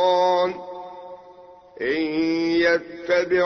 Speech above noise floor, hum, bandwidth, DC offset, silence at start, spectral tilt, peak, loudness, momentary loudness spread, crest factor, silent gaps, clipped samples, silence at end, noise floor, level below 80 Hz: 25 dB; none; 6.6 kHz; under 0.1%; 0 s; -5 dB/octave; -8 dBFS; -22 LUFS; 20 LU; 14 dB; none; under 0.1%; 0 s; -46 dBFS; -60 dBFS